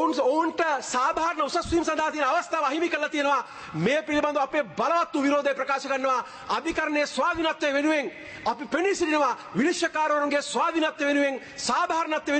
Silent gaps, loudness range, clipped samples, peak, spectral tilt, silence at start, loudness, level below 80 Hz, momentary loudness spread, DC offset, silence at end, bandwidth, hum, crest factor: none; 1 LU; under 0.1%; -12 dBFS; -3.5 dB/octave; 0 s; -25 LUFS; -56 dBFS; 4 LU; under 0.1%; 0 s; 8.8 kHz; none; 14 dB